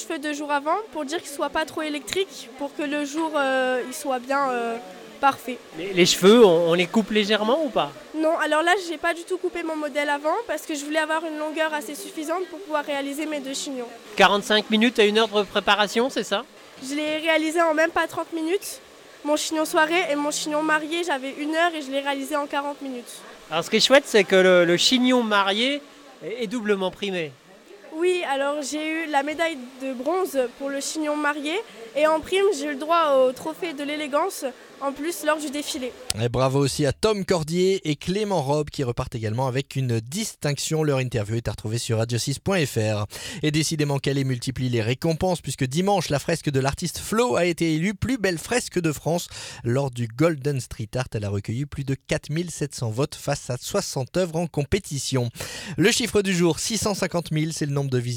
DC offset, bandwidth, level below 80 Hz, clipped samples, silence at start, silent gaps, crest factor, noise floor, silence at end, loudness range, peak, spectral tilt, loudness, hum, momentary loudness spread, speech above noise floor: under 0.1%; 18.5 kHz; -52 dBFS; under 0.1%; 0 s; none; 22 dB; -47 dBFS; 0 s; 7 LU; 0 dBFS; -4.5 dB/octave; -23 LUFS; none; 11 LU; 23 dB